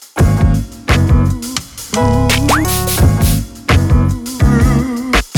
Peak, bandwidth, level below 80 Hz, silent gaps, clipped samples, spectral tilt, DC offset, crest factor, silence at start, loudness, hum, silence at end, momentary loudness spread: 0 dBFS; 19.5 kHz; -18 dBFS; none; under 0.1%; -5.5 dB/octave; under 0.1%; 12 dB; 0 s; -13 LUFS; none; 0 s; 7 LU